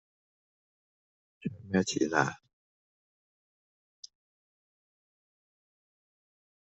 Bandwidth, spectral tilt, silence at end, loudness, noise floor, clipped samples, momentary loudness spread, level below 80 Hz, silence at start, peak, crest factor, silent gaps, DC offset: 8 kHz; -4.5 dB/octave; 2.65 s; -31 LUFS; under -90 dBFS; under 0.1%; 23 LU; -76 dBFS; 1.4 s; -10 dBFS; 28 dB; 2.53-4.03 s; under 0.1%